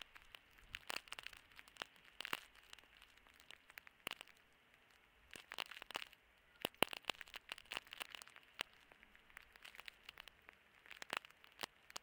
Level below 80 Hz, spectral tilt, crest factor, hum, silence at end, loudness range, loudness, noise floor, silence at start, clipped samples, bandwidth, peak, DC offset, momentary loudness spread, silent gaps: -78 dBFS; -1.5 dB/octave; 42 dB; none; 0 s; 8 LU; -49 LUFS; -71 dBFS; 0 s; under 0.1%; 18 kHz; -10 dBFS; under 0.1%; 18 LU; none